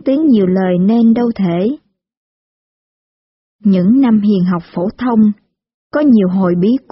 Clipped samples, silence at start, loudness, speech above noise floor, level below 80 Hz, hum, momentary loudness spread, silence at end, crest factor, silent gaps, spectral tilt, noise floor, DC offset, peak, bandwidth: under 0.1%; 0.05 s; -13 LUFS; over 79 dB; -52 dBFS; none; 8 LU; 0.15 s; 12 dB; 2.17-3.59 s, 5.74-5.90 s; -8.5 dB/octave; under -90 dBFS; under 0.1%; -2 dBFS; 5.8 kHz